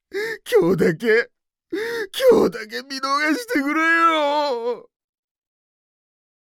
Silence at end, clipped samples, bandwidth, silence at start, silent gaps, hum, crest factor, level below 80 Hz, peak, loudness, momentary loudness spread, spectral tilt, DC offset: 1.65 s; under 0.1%; 17.5 kHz; 0.15 s; none; none; 16 dB; -58 dBFS; -6 dBFS; -19 LUFS; 13 LU; -4.5 dB/octave; under 0.1%